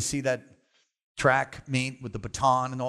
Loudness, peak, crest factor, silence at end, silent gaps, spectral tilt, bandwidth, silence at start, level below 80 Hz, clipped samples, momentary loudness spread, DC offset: -27 LUFS; -10 dBFS; 18 dB; 0 s; 1.03-1.15 s; -4.5 dB/octave; 13.5 kHz; 0 s; -54 dBFS; under 0.1%; 12 LU; under 0.1%